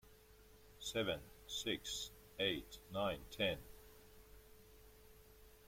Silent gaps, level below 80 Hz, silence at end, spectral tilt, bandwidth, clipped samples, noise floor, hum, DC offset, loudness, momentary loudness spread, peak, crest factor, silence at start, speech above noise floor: none; -64 dBFS; 0 s; -3 dB/octave; 16.5 kHz; under 0.1%; -64 dBFS; none; under 0.1%; -43 LUFS; 24 LU; -24 dBFS; 22 dB; 0.05 s; 22 dB